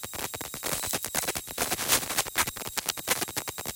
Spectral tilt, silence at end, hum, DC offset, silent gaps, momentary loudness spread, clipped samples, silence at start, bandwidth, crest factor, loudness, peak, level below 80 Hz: -1 dB/octave; 0 s; none; under 0.1%; none; 9 LU; under 0.1%; 0 s; 17.5 kHz; 24 dB; -28 LUFS; -8 dBFS; -56 dBFS